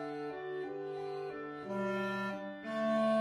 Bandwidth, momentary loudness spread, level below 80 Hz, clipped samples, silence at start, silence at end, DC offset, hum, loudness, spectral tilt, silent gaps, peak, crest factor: 12 kHz; 9 LU; -78 dBFS; under 0.1%; 0 s; 0 s; under 0.1%; none; -38 LUFS; -6.5 dB/octave; none; -22 dBFS; 16 dB